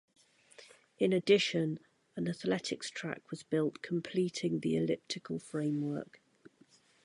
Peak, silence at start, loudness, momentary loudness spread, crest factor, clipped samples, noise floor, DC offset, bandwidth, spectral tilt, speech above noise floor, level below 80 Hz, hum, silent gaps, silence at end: -14 dBFS; 0.6 s; -34 LUFS; 13 LU; 20 dB; under 0.1%; -66 dBFS; under 0.1%; 11.5 kHz; -5.5 dB/octave; 32 dB; -76 dBFS; none; none; 1 s